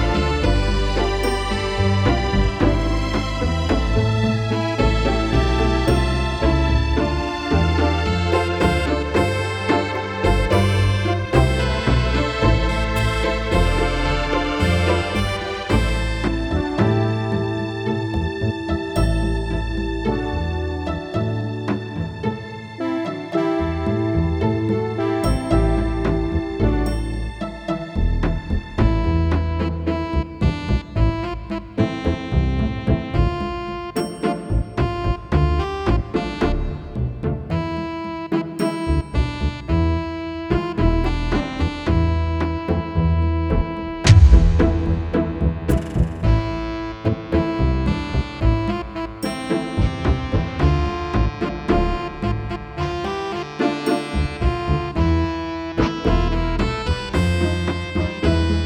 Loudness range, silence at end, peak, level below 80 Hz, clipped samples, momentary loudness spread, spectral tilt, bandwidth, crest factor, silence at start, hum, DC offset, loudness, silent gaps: 5 LU; 0 s; 0 dBFS; -24 dBFS; under 0.1%; 7 LU; -7 dB/octave; 13.5 kHz; 20 dB; 0 s; none; under 0.1%; -21 LUFS; none